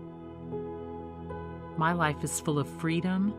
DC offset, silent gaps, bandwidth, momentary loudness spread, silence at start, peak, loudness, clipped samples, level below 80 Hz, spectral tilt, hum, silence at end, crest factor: under 0.1%; none; 15.5 kHz; 14 LU; 0 s; -12 dBFS; -32 LUFS; under 0.1%; -60 dBFS; -5.5 dB/octave; none; 0 s; 20 dB